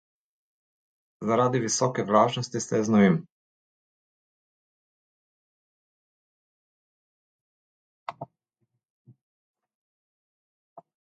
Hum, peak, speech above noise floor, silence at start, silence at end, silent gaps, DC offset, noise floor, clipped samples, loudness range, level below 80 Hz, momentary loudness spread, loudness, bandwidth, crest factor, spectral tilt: none; -6 dBFS; 55 dB; 1.2 s; 0.35 s; 3.32-8.06 s, 8.90-9.05 s, 9.21-9.54 s, 9.75-10.76 s; under 0.1%; -79 dBFS; under 0.1%; 24 LU; -70 dBFS; 21 LU; -24 LUFS; 9.2 kHz; 24 dB; -5 dB/octave